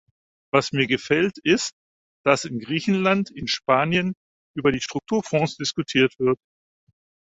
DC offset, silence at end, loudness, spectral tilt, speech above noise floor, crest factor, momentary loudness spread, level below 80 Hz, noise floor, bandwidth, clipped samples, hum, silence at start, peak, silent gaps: under 0.1%; 0.95 s; -22 LUFS; -4.5 dB/octave; over 68 dB; 22 dB; 7 LU; -56 dBFS; under -90 dBFS; 8 kHz; under 0.1%; none; 0.55 s; -2 dBFS; 1.72-2.24 s, 4.17-4.54 s